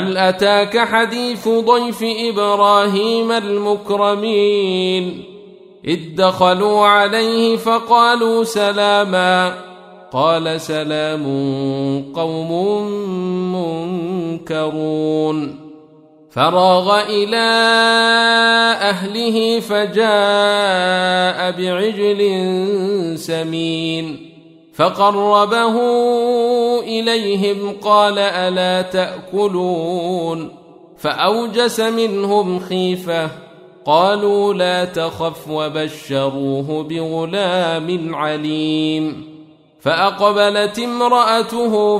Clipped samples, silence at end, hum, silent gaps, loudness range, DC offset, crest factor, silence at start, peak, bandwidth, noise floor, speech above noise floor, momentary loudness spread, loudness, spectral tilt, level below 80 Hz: under 0.1%; 0 s; none; none; 6 LU; under 0.1%; 16 dB; 0 s; 0 dBFS; 15.5 kHz; -46 dBFS; 30 dB; 10 LU; -16 LUFS; -4.5 dB/octave; -60 dBFS